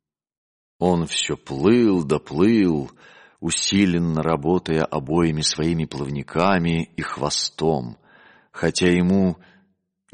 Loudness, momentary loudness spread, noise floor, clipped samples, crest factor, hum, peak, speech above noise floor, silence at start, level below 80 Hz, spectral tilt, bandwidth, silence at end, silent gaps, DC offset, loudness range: -21 LUFS; 9 LU; -65 dBFS; under 0.1%; 16 dB; none; -4 dBFS; 45 dB; 0.8 s; -48 dBFS; -5 dB/octave; 10.5 kHz; 0.8 s; none; under 0.1%; 3 LU